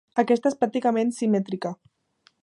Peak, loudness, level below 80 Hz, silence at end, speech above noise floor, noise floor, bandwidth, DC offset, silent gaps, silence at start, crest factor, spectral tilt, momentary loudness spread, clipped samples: -6 dBFS; -24 LUFS; -74 dBFS; 0.7 s; 41 dB; -64 dBFS; 11.5 kHz; under 0.1%; none; 0.15 s; 18 dB; -6.5 dB/octave; 10 LU; under 0.1%